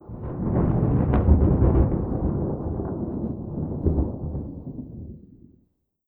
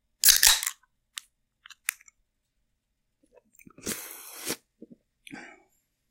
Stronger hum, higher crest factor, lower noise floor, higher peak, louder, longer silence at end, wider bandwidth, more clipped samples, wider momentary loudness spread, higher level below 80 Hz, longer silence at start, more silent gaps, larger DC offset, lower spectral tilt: neither; second, 18 dB vs 28 dB; second, -67 dBFS vs -78 dBFS; about the same, -6 dBFS vs -4 dBFS; about the same, -24 LUFS vs -23 LUFS; first, 0.85 s vs 0.65 s; second, 2.9 kHz vs 17 kHz; neither; second, 17 LU vs 28 LU; first, -28 dBFS vs -56 dBFS; second, 0.05 s vs 0.25 s; neither; neither; first, -13.5 dB/octave vs 1.5 dB/octave